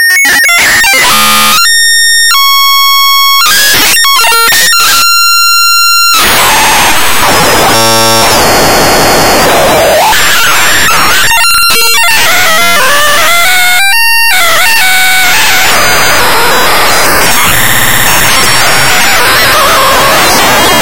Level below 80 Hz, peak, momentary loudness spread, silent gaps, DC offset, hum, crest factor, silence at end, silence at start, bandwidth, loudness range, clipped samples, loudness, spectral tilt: -28 dBFS; 0 dBFS; 2 LU; none; 20%; none; 6 dB; 0 s; 0 s; over 20 kHz; 2 LU; 0.5%; -3 LUFS; -1 dB/octave